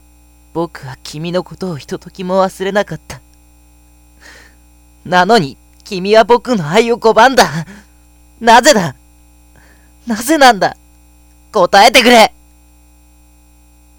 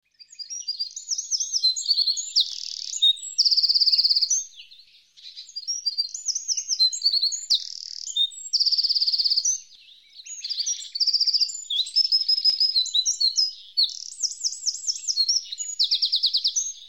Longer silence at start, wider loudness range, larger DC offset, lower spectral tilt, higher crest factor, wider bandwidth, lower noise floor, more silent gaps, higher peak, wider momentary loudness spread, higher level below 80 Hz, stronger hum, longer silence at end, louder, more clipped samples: first, 0.55 s vs 0.2 s; first, 9 LU vs 3 LU; second, under 0.1% vs 0.1%; first, -3.5 dB/octave vs 7.5 dB/octave; about the same, 14 dB vs 16 dB; first, over 20 kHz vs 17.5 kHz; second, -45 dBFS vs -53 dBFS; neither; first, 0 dBFS vs -8 dBFS; first, 19 LU vs 12 LU; first, -44 dBFS vs -82 dBFS; first, 60 Hz at -40 dBFS vs none; first, 1.7 s vs 0 s; first, -11 LUFS vs -21 LUFS; first, 0.8% vs under 0.1%